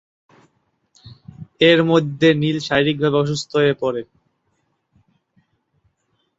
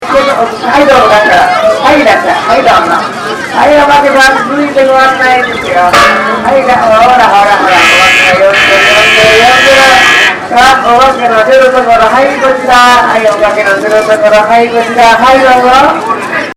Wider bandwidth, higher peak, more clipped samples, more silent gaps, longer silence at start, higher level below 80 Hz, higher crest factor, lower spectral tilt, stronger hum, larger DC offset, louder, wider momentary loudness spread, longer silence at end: second, 8 kHz vs 17.5 kHz; about the same, -2 dBFS vs 0 dBFS; second, under 0.1% vs 8%; neither; first, 1.05 s vs 0 s; second, -56 dBFS vs -34 dBFS; first, 20 dB vs 4 dB; first, -6 dB/octave vs -3 dB/octave; neither; neither; second, -17 LUFS vs -4 LUFS; first, 9 LU vs 6 LU; first, 2.35 s vs 0.05 s